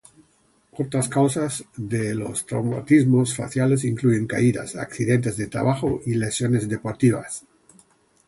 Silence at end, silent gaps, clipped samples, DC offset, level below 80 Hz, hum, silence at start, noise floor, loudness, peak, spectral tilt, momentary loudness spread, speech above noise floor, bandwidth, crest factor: 0.9 s; none; under 0.1%; under 0.1%; -54 dBFS; none; 0.75 s; -62 dBFS; -22 LUFS; -4 dBFS; -6 dB/octave; 10 LU; 40 dB; 11.5 kHz; 18 dB